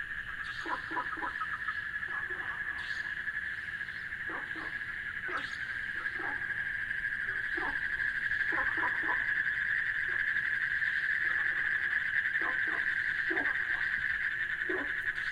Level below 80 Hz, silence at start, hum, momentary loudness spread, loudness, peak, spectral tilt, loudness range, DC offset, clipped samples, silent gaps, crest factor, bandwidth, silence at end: -60 dBFS; 0 s; none; 7 LU; -32 LUFS; -18 dBFS; -3.5 dB/octave; 6 LU; under 0.1%; under 0.1%; none; 16 dB; 15 kHz; 0 s